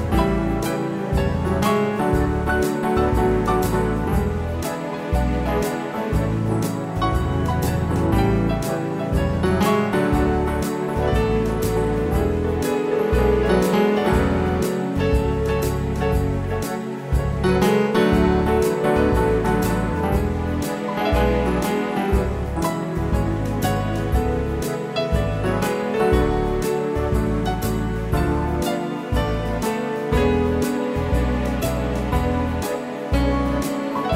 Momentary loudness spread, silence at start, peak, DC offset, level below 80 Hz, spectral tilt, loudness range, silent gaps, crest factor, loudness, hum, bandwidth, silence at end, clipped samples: 6 LU; 0 s; -6 dBFS; under 0.1%; -28 dBFS; -6.5 dB/octave; 3 LU; none; 14 dB; -21 LUFS; none; 16 kHz; 0 s; under 0.1%